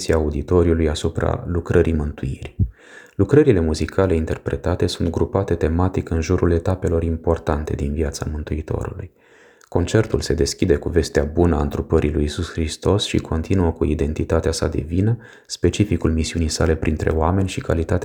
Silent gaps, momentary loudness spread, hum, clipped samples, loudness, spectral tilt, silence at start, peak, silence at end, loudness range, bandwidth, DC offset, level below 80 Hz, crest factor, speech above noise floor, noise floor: none; 7 LU; none; under 0.1%; -20 LUFS; -6.5 dB/octave; 0 s; -2 dBFS; 0 s; 3 LU; 15 kHz; under 0.1%; -30 dBFS; 18 dB; 21 dB; -41 dBFS